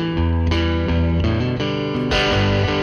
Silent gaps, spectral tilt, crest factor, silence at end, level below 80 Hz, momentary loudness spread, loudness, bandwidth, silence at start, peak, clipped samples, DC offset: none; -6.5 dB/octave; 12 dB; 0 s; -26 dBFS; 4 LU; -19 LUFS; 7 kHz; 0 s; -8 dBFS; under 0.1%; under 0.1%